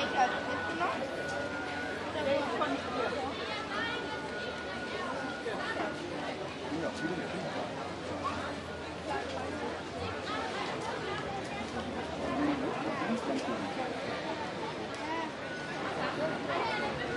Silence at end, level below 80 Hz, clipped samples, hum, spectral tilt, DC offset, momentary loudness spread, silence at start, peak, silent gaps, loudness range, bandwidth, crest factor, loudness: 0 s; -62 dBFS; under 0.1%; none; -4.5 dB/octave; under 0.1%; 6 LU; 0 s; -16 dBFS; none; 3 LU; 11.5 kHz; 20 dB; -35 LUFS